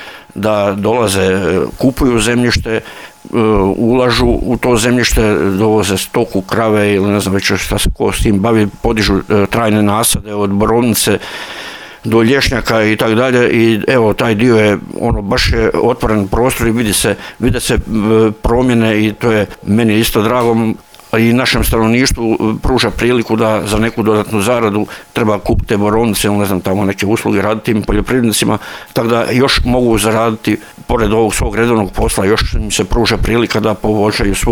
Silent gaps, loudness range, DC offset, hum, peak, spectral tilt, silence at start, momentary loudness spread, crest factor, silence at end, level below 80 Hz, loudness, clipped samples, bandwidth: none; 2 LU; under 0.1%; none; 0 dBFS; -5 dB/octave; 0 s; 5 LU; 12 dB; 0 s; -24 dBFS; -12 LUFS; under 0.1%; 20 kHz